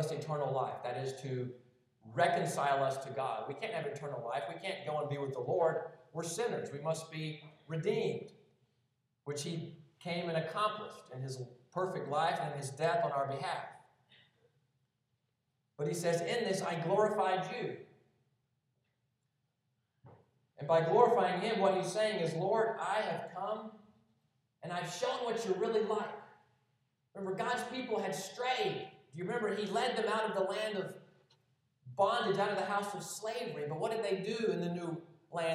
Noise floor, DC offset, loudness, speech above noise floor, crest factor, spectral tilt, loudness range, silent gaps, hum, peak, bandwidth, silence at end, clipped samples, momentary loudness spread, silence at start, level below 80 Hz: -82 dBFS; under 0.1%; -36 LUFS; 47 dB; 24 dB; -5 dB/octave; 7 LU; none; none; -12 dBFS; 14.5 kHz; 0 s; under 0.1%; 13 LU; 0 s; -88 dBFS